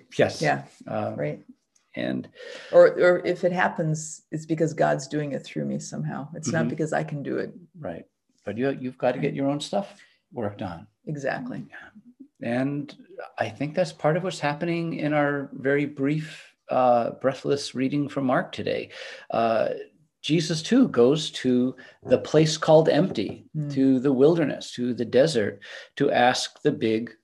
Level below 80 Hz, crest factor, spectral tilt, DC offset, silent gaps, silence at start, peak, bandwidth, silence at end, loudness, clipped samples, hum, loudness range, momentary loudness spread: -70 dBFS; 20 dB; -5.5 dB/octave; under 0.1%; none; 0.1 s; -6 dBFS; 12 kHz; 0.1 s; -24 LUFS; under 0.1%; none; 8 LU; 17 LU